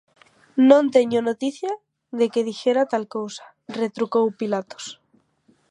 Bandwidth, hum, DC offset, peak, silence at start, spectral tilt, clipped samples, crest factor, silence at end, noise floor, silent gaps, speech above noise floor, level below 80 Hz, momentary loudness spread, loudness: 10.5 kHz; none; under 0.1%; -2 dBFS; 0.55 s; -5 dB/octave; under 0.1%; 22 dB; 0.75 s; -62 dBFS; none; 41 dB; -76 dBFS; 19 LU; -21 LUFS